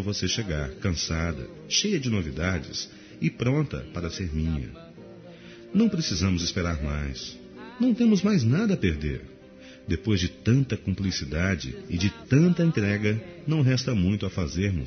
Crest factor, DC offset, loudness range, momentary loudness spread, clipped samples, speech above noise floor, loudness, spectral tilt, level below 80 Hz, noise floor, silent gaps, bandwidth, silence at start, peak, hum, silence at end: 16 dB; under 0.1%; 4 LU; 15 LU; under 0.1%; 22 dB; -26 LUFS; -6 dB/octave; -44 dBFS; -47 dBFS; none; 6.6 kHz; 0 s; -8 dBFS; none; 0 s